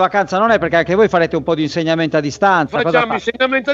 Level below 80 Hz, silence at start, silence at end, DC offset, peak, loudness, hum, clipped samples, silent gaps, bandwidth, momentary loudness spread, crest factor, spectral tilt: -46 dBFS; 0 s; 0 s; under 0.1%; 0 dBFS; -15 LUFS; none; under 0.1%; none; 7.8 kHz; 5 LU; 14 dB; -5.5 dB/octave